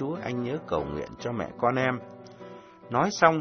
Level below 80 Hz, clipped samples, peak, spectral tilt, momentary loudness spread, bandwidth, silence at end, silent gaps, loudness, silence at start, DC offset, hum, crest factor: -56 dBFS; under 0.1%; -2 dBFS; -5.5 dB/octave; 22 LU; 6.6 kHz; 0 s; none; -28 LUFS; 0 s; under 0.1%; none; 26 dB